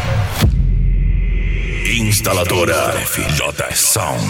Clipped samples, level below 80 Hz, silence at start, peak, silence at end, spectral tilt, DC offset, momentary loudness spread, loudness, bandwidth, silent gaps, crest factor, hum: under 0.1%; -20 dBFS; 0 s; -2 dBFS; 0 s; -3.5 dB/octave; under 0.1%; 6 LU; -16 LUFS; 17 kHz; none; 14 dB; none